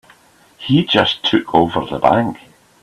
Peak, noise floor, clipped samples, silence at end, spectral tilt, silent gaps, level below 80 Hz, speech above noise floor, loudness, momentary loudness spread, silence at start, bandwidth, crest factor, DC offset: 0 dBFS; -49 dBFS; under 0.1%; 0.45 s; -6.5 dB/octave; none; -48 dBFS; 34 dB; -15 LUFS; 10 LU; 0.6 s; 13 kHz; 16 dB; under 0.1%